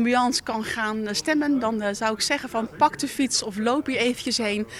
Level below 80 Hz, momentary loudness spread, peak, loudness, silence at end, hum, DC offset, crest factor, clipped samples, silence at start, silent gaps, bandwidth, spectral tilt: -58 dBFS; 4 LU; -6 dBFS; -24 LUFS; 0 s; none; under 0.1%; 18 dB; under 0.1%; 0 s; none; 15.5 kHz; -3 dB/octave